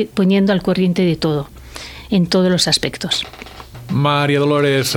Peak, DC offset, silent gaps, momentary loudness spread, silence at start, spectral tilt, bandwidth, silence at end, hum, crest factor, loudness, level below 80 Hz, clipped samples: 0 dBFS; under 0.1%; none; 18 LU; 0 s; -5 dB/octave; 17 kHz; 0 s; none; 16 dB; -16 LUFS; -44 dBFS; under 0.1%